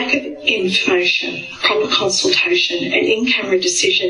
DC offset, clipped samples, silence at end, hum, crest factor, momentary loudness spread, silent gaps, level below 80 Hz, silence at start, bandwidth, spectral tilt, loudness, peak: under 0.1%; under 0.1%; 0 s; none; 16 dB; 4 LU; none; -56 dBFS; 0 s; 11 kHz; -2 dB/octave; -15 LUFS; 0 dBFS